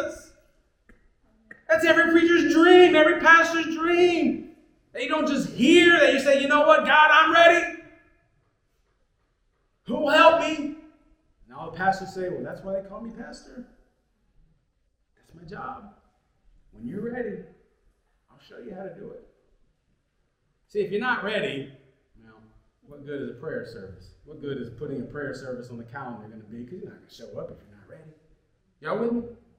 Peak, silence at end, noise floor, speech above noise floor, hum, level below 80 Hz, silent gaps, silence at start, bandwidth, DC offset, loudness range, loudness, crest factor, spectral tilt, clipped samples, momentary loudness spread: -2 dBFS; 0.25 s; -72 dBFS; 49 dB; none; -60 dBFS; none; 0 s; 15.5 kHz; under 0.1%; 21 LU; -20 LUFS; 22 dB; -4 dB/octave; under 0.1%; 26 LU